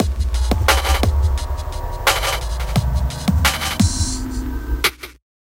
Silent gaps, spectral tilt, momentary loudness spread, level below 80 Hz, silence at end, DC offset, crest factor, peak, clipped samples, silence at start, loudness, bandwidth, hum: none; -4 dB/octave; 10 LU; -22 dBFS; 0.4 s; under 0.1%; 18 dB; -2 dBFS; under 0.1%; 0 s; -19 LUFS; 17 kHz; none